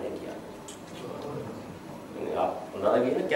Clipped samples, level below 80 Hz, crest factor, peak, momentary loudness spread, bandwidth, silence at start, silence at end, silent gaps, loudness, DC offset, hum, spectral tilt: under 0.1%; -64 dBFS; 20 dB; -12 dBFS; 16 LU; 16 kHz; 0 s; 0 s; none; -32 LUFS; under 0.1%; none; -5.5 dB/octave